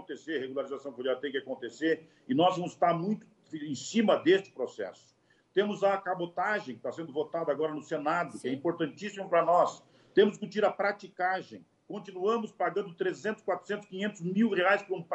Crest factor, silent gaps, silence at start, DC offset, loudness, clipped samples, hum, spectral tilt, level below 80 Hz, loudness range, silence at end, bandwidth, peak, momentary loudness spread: 20 dB; none; 0 s; under 0.1%; -31 LUFS; under 0.1%; none; -5.5 dB/octave; -82 dBFS; 4 LU; 0 s; 11 kHz; -12 dBFS; 12 LU